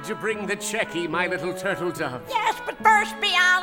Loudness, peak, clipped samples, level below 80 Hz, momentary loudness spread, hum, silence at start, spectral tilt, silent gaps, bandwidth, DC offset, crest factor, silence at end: -23 LUFS; -4 dBFS; under 0.1%; -58 dBFS; 9 LU; none; 0 s; -2.5 dB/octave; none; 18 kHz; under 0.1%; 20 dB; 0 s